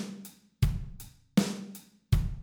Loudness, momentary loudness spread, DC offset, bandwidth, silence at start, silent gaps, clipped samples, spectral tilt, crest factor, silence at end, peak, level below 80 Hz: -32 LUFS; 20 LU; under 0.1%; over 20 kHz; 0 s; none; under 0.1%; -6 dB/octave; 20 dB; 0 s; -12 dBFS; -38 dBFS